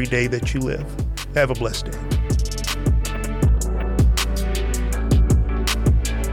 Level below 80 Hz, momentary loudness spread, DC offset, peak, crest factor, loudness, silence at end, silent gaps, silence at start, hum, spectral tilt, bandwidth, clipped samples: -22 dBFS; 6 LU; under 0.1%; -6 dBFS; 14 dB; -22 LUFS; 0 s; none; 0 s; none; -5 dB/octave; 17 kHz; under 0.1%